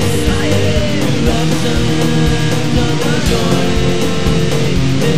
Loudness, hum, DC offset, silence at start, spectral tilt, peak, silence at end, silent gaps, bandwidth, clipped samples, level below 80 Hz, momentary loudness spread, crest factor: -14 LUFS; none; 10%; 0 s; -5.5 dB/octave; 0 dBFS; 0 s; none; 16 kHz; under 0.1%; -24 dBFS; 1 LU; 12 dB